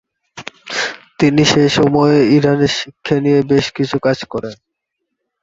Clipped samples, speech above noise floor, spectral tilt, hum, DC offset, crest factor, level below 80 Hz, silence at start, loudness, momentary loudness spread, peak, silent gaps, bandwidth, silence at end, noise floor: under 0.1%; 62 dB; -5.5 dB/octave; none; under 0.1%; 16 dB; -48 dBFS; 0.35 s; -14 LUFS; 14 LU; 0 dBFS; none; 8 kHz; 0.9 s; -75 dBFS